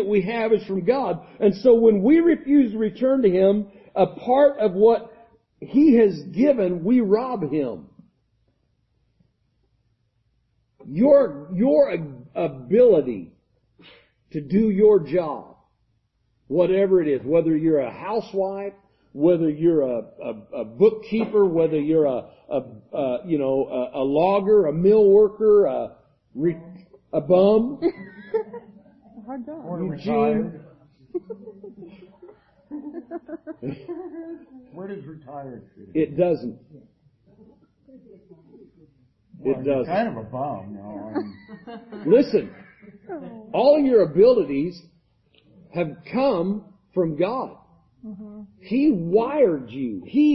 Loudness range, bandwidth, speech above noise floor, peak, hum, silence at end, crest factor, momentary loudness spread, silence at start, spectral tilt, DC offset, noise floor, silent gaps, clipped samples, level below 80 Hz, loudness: 11 LU; 6 kHz; 48 dB; -4 dBFS; none; 0 s; 18 dB; 20 LU; 0 s; -10 dB/octave; under 0.1%; -68 dBFS; none; under 0.1%; -58 dBFS; -21 LUFS